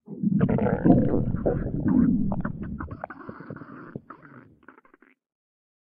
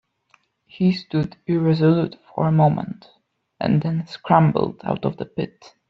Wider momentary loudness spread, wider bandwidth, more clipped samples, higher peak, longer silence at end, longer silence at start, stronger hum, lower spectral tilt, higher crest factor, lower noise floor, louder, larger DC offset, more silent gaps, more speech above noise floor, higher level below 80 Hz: first, 21 LU vs 12 LU; second, 3.3 kHz vs 6 kHz; neither; about the same, -4 dBFS vs -2 dBFS; first, 1.6 s vs 0.45 s; second, 0.1 s vs 0.75 s; neither; first, -11 dB/octave vs -9.5 dB/octave; first, 24 dB vs 18 dB; about the same, -59 dBFS vs -62 dBFS; second, -24 LUFS vs -21 LUFS; neither; neither; about the same, 38 dB vs 41 dB; first, -40 dBFS vs -56 dBFS